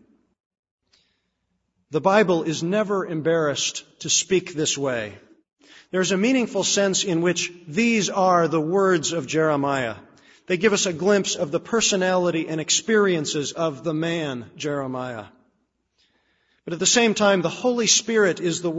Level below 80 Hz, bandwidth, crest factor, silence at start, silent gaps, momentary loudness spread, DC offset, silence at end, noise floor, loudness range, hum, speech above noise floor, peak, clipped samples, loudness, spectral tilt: -64 dBFS; 8 kHz; 18 dB; 1.9 s; none; 11 LU; under 0.1%; 0 s; -74 dBFS; 4 LU; none; 53 dB; -4 dBFS; under 0.1%; -21 LUFS; -3.5 dB/octave